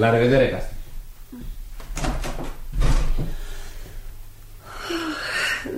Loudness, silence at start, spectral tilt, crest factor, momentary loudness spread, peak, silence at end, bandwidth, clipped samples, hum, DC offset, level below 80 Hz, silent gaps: -24 LUFS; 0 s; -5.5 dB/octave; 18 dB; 24 LU; -6 dBFS; 0 s; 16 kHz; under 0.1%; none; under 0.1%; -28 dBFS; none